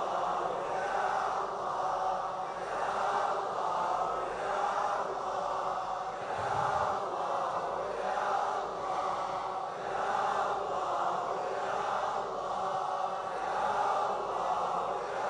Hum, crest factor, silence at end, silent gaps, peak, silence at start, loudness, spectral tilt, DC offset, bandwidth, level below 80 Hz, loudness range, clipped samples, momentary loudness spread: none; 14 dB; 0 s; none; -18 dBFS; 0 s; -33 LUFS; -4 dB/octave; under 0.1%; 10.5 kHz; -64 dBFS; 1 LU; under 0.1%; 4 LU